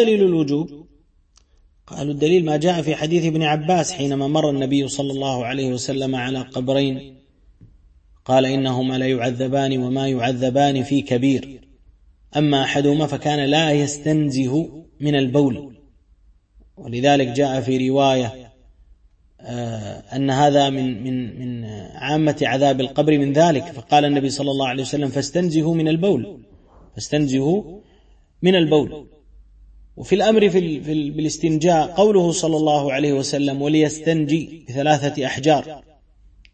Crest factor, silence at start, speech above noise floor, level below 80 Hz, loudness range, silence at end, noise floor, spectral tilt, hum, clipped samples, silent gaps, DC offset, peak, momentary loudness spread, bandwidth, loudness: 18 dB; 0 s; 38 dB; -52 dBFS; 4 LU; 0.75 s; -57 dBFS; -5.5 dB/octave; none; under 0.1%; none; under 0.1%; -2 dBFS; 12 LU; 8.8 kHz; -19 LUFS